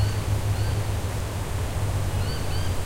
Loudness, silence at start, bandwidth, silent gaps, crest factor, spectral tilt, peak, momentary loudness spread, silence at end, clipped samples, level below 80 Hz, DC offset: -27 LUFS; 0 s; 16 kHz; none; 12 dB; -5.5 dB/octave; -12 dBFS; 4 LU; 0 s; under 0.1%; -32 dBFS; under 0.1%